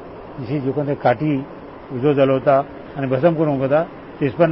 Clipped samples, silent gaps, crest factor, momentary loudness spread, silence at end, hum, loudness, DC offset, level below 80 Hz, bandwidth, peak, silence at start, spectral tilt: under 0.1%; none; 16 dB; 15 LU; 0 s; none; -19 LUFS; 0.1%; -50 dBFS; 5.8 kHz; -4 dBFS; 0 s; -12.5 dB/octave